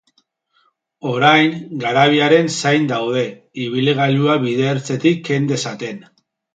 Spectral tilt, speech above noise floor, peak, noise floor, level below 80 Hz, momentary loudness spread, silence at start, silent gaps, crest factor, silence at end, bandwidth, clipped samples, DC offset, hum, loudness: -5 dB/octave; 46 dB; 0 dBFS; -63 dBFS; -64 dBFS; 13 LU; 1.05 s; none; 16 dB; 0.55 s; 9.2 kHz; under 0.1%; under 0.1%; none; -16 LUFS